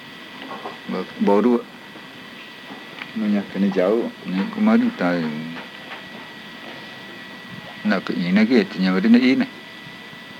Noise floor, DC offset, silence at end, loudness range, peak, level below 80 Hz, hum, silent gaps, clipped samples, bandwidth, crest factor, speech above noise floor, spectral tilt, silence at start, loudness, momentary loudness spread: -39 dBFS; under 0.1%; 0 s; 5 LU; -4 dBFS; -68 dBFS; none; none; under 0.1%; 10.5 kHz; 18 dB; 20 dB; -7 dB/octave; 0 s; -20 LUFS; 20 LU